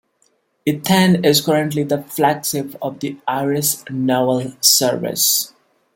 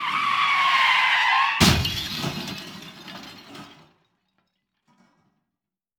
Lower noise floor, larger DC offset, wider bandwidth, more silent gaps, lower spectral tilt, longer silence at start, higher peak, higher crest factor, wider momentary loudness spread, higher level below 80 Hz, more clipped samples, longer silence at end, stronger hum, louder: second, -62 dBFS vs -86 dBFS; neither; second, 17 kHz vs over 20 kHz; neither; about the same, -3.5 dB/octave vs -3 dB/octave; first, 0.65 s vs 0 s; about the same, 0 dBFS vs -2 dBFS; about the same, 18 dB vs 22 dB; second, 12 LU vs 22 LU; second, -60 dBFS vs -44 dBFS; neither; second, 0.5 s vs 2.3 s; neither; first, -17 LUFS vs -20 LUFS